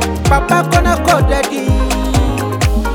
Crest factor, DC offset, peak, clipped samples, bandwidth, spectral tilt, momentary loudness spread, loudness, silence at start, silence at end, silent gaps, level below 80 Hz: 12 dB; under 0.1%; 0 dBFS; under 0.1%; 18.5 kHz; -5.5 dB/octave; 4 LU; -13 LUFS; 0 s; 0 s; none; -18 dBFS